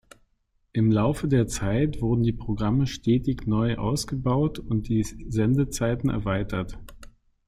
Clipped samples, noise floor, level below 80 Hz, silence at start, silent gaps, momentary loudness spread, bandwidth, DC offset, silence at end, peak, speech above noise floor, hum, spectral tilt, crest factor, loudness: under 0.1%; -69 dBFS; -40 dBFS; 0.75 s; none; 6 LU; 15 kHz; under 0.1%; 0.4 s; -10 dBFS; 45 dB; none; -7 dB/octave; 14 dB; -25 LUFS